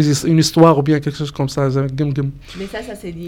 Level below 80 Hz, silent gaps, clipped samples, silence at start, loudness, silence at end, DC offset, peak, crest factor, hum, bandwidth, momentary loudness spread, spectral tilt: -42 dBFS; none; under 0.1%; 0 s; -16 LUFS; 0 s; under 0.1%; 0 dBFS; 16 dB; none; 16.5 kHz; 17 LU; -6 dB/octave